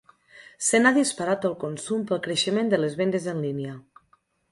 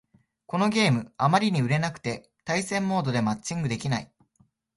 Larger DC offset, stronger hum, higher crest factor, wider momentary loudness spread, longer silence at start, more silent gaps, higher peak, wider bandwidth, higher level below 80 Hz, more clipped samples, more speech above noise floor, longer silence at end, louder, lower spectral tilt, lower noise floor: neither; neither; about the same, 20 dB vs 18 dB; about the same, 12 LU vs 10 LU; second, 0.35 s vs 0.5 s; neither; about the same, -6 dBFS vs -8 dBFS; about the same, 11.5 kHz vs 11.5 kHz; second, -68 dBFS vs -60 dBFS; neither; about the same, 41 dB vs 41 dB; about the same, 0.7 s vs 0.7 s; about the same, -24 LUFS vs -26 LUFS; second, -4 dB/octave vs -5.5 dB/octave; about the same, -65 dBFS vs -66 dBFS